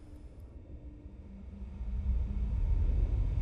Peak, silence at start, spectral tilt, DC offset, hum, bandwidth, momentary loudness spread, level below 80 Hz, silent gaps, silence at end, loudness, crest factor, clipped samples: -18 dBFS; 0 s; -9.5 dB/octave; under 0.1%; none; 3.8 kHz; 19 LU; -34 dBFS; none; 0 s; -35 LUFS; 14 dB; under 0.1%